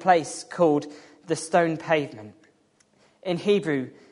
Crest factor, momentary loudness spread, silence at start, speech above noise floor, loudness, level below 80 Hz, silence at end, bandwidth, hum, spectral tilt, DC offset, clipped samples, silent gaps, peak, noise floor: 20 dB; 14 LU; 0 s; 39 dB; -25 LUFS; -72 dBFS; 0.2 s; 11 kHz; none; -5 dB/octave; under 0.1%; under 0.1%; none; -4 dBFS; -63 dBFS